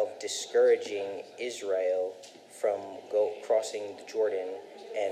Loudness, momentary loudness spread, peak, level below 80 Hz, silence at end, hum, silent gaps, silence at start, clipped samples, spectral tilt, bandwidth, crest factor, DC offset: -31 LUFS; 14 LU; -14 dBFS; under -90 dBFS; 0 s; none; none; 0 s; under 0.1%; -2 dB/octave; 14 kHz; 16 dB; under 0.1%